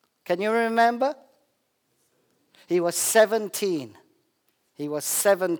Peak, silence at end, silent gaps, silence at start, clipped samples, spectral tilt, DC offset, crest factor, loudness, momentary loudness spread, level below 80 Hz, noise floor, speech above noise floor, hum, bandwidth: -6 dBFS; 0 s; none; 0.3 s; under 0.1%; -3 dB/octave; under 0.1%; 20 dB; -23 LUFS; 12 LU; -82 dBFS; -72 dBFS; 49 dB; none; over 20 kHz